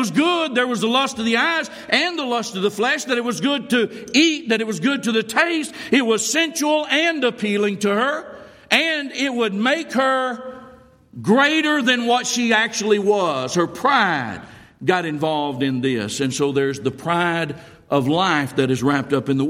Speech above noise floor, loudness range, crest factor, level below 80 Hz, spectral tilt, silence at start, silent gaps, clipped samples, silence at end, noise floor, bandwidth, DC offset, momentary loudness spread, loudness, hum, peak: 27 dB; 3 LU; 18 dB; -62 dBFS; -4 dB/octave; 0 s; none; under 0.1%; 0 s; -46 dBFS; 16 kHz; under 0.1%; 6 LU; -19 LUFS; none; -2 dBFS